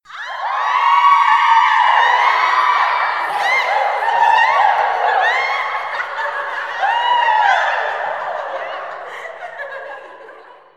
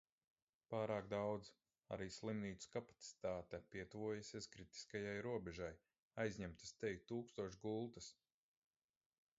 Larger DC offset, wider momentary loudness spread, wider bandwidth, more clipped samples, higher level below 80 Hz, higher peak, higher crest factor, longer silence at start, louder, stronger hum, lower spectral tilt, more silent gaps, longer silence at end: first, 0.2% vs under 0.1%; first, 17 LU vs 10 LU; first, 12.5 kHz vs 7.6 kHz; neither; about the same, -74 dBFS vs -72 dBFS; first, 0 dBFS vs -28 dBFS; about the same, 16 dB vs 20 dB; second, 0.1 s vs 0.7 s; first, -15 LUFS vs -49 LUFS; neither; second, 0 dB/octave vs -5 dB/octave; second, none vs 5.99-6.11 s; second, 0.25 s vs 1.25 s